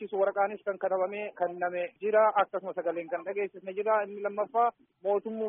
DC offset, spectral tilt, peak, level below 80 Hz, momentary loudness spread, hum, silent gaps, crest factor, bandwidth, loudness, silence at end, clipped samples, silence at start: under 0.1%; 1 dB/octave; -12 dBFS; -84 dBFS; 9 LU; none; none; 18 dB; 3.7 kHz; -30 LUFS; 0 s; under 0.1%; 0 s